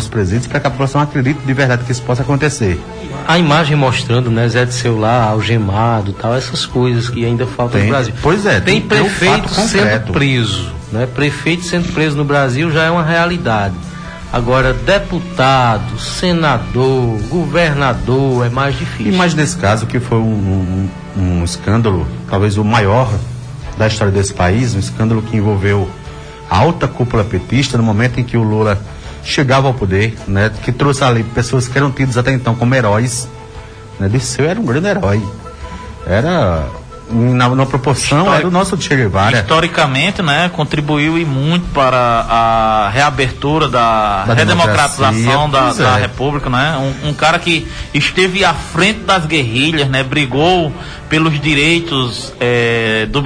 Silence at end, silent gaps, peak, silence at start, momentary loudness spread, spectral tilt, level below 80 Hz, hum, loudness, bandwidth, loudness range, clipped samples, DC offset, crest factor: 0 s; none; 0 dBFS; 0 s; 7 LU; -5.5 dB/octave; -32 dBFS; none; -13 LUFS; 10.5 kHz; 3 LU; under 0.1%; under 0.1%; 12 dB